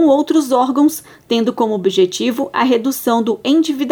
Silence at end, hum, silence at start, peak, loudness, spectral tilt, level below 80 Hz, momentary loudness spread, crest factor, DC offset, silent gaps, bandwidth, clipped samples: 0 s; none; 0 s; -2 dBFS; -15 LUFS; -4.5 dB/octave; -62 dBFS; 4 LU; 12 dB; under 0.1%; none; over 20 kHz; under 0.1%